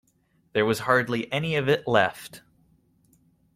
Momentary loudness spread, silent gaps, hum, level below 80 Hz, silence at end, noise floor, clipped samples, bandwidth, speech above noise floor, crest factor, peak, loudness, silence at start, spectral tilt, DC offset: 9 LU; none; none; -62 dBFS; 1.2 s; -67 dBFS; under 0.1%; 16 kHz; 42 dB; 22 dB; -6 dBFS; -24 LUFS; 0.55 s; -5.5 dB/octave; under 0.1%